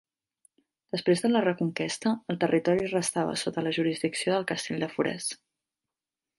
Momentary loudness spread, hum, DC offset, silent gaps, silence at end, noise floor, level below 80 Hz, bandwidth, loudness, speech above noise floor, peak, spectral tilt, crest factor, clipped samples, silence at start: 7 LU; none; under 0.1%; none; 1.05 s; under -90 dBFS; -68 dBFS; 11.5 kHz; -28 LUFS; over 63 dB; -10 dBFS; -4.5 dB/octave; 18 dB; under 0.1%; 0.95 s